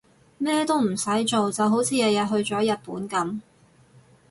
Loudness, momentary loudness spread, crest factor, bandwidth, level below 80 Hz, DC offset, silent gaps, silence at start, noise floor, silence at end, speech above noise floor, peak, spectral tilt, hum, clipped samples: -24 LUFS; 8 LU; 14 dB; 11.5 kHz; -64 dBFS; under 0.1%; none; 0.4 s; -55 dBFS; 0.9 s; 32 dB; -10 dBFS; -4 dB/octave; none; under 0.1%